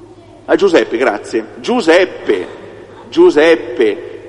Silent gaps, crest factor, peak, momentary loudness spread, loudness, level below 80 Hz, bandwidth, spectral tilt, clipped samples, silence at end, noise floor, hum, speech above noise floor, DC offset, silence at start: none; 14 dB; 0 dBFS; 11 LU; -13 LUFS; -52 dBFS; 10.5 kHz; -4.5 dB/octave; under 0.1%; 0 s; -33 dBFS; none; 22 dB; under 0.1%; 0.5 s